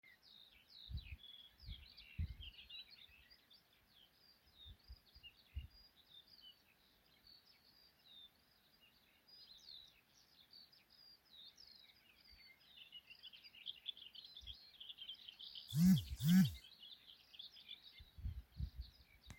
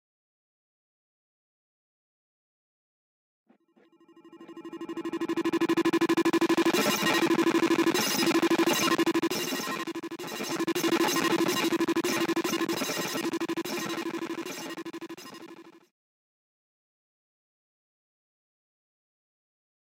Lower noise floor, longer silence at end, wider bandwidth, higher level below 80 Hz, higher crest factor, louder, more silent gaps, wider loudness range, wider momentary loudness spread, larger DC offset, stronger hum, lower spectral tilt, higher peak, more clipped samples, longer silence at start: first, -74 dBFS vs -63 dBFS; second, 0.05 s vs 4.3 s; about the same, 16.5 kHz vs 17 kHz; first, -62 dBFS vs -76 dBFS; first, 24 dB vs 18 dB; second, -44 LUFS vs -27 LUFS; neither; first, 23 LU vs 15 LU; first, 27 LU vs 15 LU; neither; neither; first, -5.5 dB/octave vs -3 dB/octave; second, -22 dBFS vs -14 dBFS; neither; second, 0.75 s vs 4.25 s